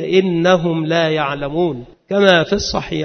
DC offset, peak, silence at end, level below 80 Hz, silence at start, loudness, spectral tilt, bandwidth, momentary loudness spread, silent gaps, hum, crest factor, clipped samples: under 0.1%; 0 dBFS; 0 s; -42 dBFS; 0 s; -16 LUFS; -5.5 dB/octave; 6.6 kHz; 8 LU; none; none; 16 dB; under 0.1%